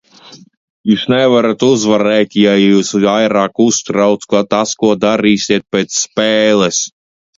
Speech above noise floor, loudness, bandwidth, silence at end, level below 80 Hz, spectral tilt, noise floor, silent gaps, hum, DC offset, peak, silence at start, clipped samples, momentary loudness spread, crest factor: 28 dB; -12 LUFS; 7.8 kHz; 0.5 s; -54 dBFS; -4 dB/octave; -40 dBFS; 0.57-0.84 s; none; under 0.1%; 0 dBFS; 0.3 s; under 0.1%; 5 LU; 12 dB